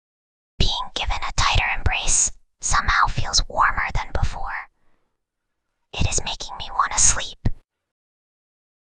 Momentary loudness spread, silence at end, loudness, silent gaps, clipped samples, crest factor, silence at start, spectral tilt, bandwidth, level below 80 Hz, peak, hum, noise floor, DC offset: 13 LU; 1.35 s; -21 LUFS; none; under 0.1%; 20 dB; 0.6 s; -1.5 dB/octave; 10 kHz; -28 dBFS; -2 dBFS; none; -77 dBFS; under 0.1%